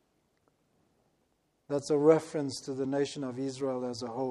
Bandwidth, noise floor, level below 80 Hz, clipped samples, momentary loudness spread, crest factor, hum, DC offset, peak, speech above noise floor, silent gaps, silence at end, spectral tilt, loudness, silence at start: 12 kHz; -75 dBFS; -76 dBFS; under 0.1%; 11 LU; 22 dB; none; under 0.1%; -10 dBFS; 44 dB; none; 0 s; -6 dB/octave; -31 LUFS; 1.7 s